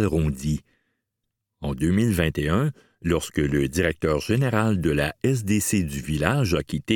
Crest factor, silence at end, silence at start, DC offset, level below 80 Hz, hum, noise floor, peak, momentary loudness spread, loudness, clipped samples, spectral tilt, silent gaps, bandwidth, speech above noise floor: 22 dB; 0 s; 0 s; under 0.1%; -38 dBFS; none; -81 dBFS; -2 dBFS; 7 LU; -24 LUFS; under 0.1%; -6 dB/octave; none; 19 kHz; 58 dB